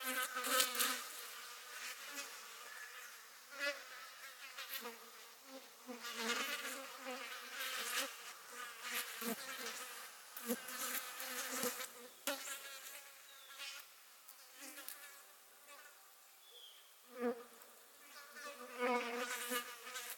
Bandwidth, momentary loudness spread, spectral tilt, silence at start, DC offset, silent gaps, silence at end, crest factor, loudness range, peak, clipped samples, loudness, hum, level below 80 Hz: 17.5 kHz; 18 LU; 0 dB/octave; 0 s; under 0.1%; none; 0 s; 36 dB; 9 LU; -10 dBFS; under 0.1%; -43 LUFS; none; under -90 dBFS